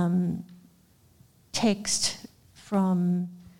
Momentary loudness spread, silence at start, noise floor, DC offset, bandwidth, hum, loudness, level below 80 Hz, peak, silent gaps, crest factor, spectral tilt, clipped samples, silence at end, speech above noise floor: 12 LU; 0 s; -60 dBFS; under 0.1%; 15.5 kHz; none; -27 LUFS; -62 dBFS; -12 dBFS; none; 16 dB; -4.5 dB/octave; under 0.1%; 0.1 s; 34 dB